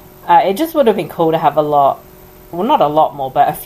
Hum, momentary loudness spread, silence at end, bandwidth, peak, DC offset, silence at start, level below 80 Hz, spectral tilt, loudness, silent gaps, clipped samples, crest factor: none; 4 LU; 0 s; 15.5 kHz; 0 dBFS; under 0.1%; 0.25 s; -48 dBFS; -6 dB/octave; -14 LUFS; none; under 0.1%; 14 dB